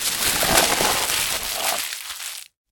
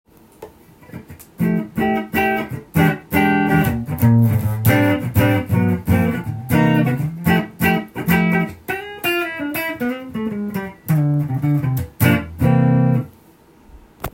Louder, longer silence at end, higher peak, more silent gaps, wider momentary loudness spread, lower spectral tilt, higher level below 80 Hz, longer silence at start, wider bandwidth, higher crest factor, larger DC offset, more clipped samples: about the same, -20 LUFS vs -18 LUFS; first, 0.25 s vs 0.05 s; about the same, 0 dBFS vs 0 dBFS; neither; first, 14 LU vs 10 LU; second, -0.5 dB/octave vs -7 dB/octave; about the same, -44 dBFS vs -44 dBFS; second, 0 s vs 0.4 s; first, 19 kHz vs 17 kHz; about the same, 22 dB vs 18 dB; neither; neither